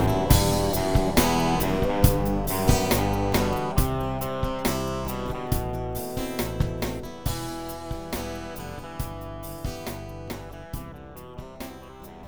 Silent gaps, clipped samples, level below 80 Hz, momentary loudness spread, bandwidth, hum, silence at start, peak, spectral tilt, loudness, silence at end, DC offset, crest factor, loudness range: none; under 0.1%; -34 dBFS; 17 LU; over 20 kHz; none; 0 s; -2 dBFS; -5 dB/octave; -26 LUFS; 0 s; 0.7%; 22 dB; 13 LU